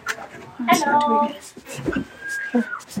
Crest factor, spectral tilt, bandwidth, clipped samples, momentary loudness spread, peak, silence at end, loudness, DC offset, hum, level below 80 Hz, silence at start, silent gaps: 22 dB; -4 dB/octave; 16.5 kHz; under 0.1%; 15 LU; -2 dBFS; 0 s; -22 LUFS; under 0.1%; none; -52 dBFS; 0 s; none